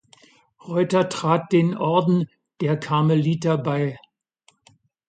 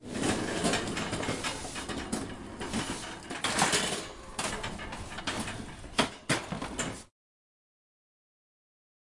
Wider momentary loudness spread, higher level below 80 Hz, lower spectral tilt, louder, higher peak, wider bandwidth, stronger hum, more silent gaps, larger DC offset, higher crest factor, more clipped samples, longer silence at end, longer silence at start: second, 8 LU vs 11 LU; second, -66 dBFS vs -52 dBFS; first, -7.5 dB/octave vs -3 dB/octave; first, -22 LUFS vs -33 LUFS; first, -6 dBFS vs -10 dBFS; second, 9.2 kHz vs 11.5 kHz; neither; neither; neither; second, 18 dB vs 24 dB; neither; second, 1.15 s vs 2 s; first, 0.65 s vs 0 s